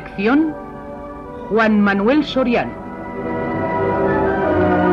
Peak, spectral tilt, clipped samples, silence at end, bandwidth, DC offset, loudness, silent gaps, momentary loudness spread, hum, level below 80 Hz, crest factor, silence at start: -4 dBFS; -8 dB/octave; under 0.1%; 0 s; 7 kHz; under 0.1%; -17 LUFS; none; 17 LU; none; -40 dBFS; 12 dB; 0 s